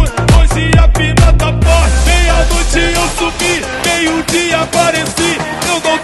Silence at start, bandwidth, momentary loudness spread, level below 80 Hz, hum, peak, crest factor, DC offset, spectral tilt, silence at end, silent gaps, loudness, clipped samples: 0 s; 12.5 kHz; 4 LU; -14 dBFS; none; 0 dBFS; 10 dB; under 0.1%; -4 dB/octave; 0 s; none; -11 LUFS; under 0.1%